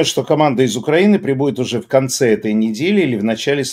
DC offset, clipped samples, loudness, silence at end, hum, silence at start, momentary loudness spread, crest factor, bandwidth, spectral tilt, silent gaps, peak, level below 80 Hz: under 0.1%; under 0.1%; -15 LUFS; 0 s; none; 0 s; 5 LU; 14 dB; 16 kHz; -5 dB/octave; none; 0 dBFS; -60 dBFS